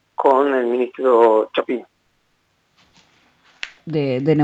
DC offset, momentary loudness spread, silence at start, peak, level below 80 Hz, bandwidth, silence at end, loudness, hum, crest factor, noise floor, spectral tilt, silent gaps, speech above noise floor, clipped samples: under 0.1%; 16 LU; 0.2 s; -2 dBFS; -68 dBFS; 8 kHz; 0 s; -18 LUFS; none; 16 dB; -65 dBFS; -8 dB/octave; none; 48 dB; under 0.1%